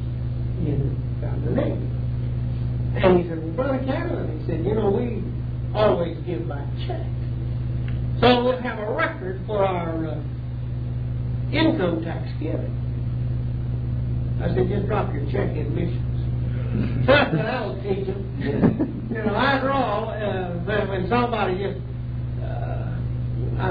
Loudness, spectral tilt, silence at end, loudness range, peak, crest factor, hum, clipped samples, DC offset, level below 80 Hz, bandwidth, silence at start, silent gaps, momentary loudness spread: -24 LUFS; -10 dB/octave; 0 s; 3 LU; -4 dBFS; 20 dB; none; under 0.1%; under 0.1%; -34 dBFS; 5 kHz; 0 s; none; 8 LU